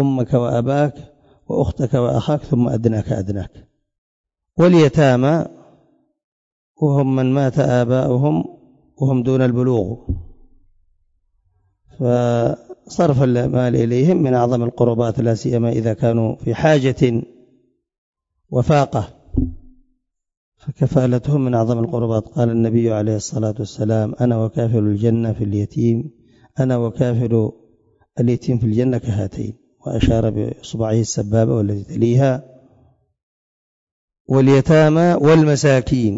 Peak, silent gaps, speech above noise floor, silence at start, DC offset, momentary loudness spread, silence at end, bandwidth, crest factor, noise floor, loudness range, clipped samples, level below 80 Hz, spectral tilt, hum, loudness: -2 dBFS; 3.98-4.24 s, 6.24-6.75 s, 17.98-18.13 s, 20.37-20.52 s, 33.23-34.08 s, 34.20-34.25 s; 51 dB; 0 s; under 0.1%; 11 LU; 0 s; 7.8 kHz; 16 dB; -67 dBFS; 4 LU; under 0.1%; -40 dBFS; -7.5 dB/octave; none; -17 LUFS